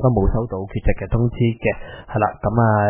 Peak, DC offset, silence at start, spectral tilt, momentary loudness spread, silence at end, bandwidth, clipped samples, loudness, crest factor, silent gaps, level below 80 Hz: -4 dBFS; under 0.1%; 0 s; -12 dB/octave; 7 LU; 0 s; 3.4 kHz; under 0.1%; -21 LUFS; 16 dB; none; -28 dBFS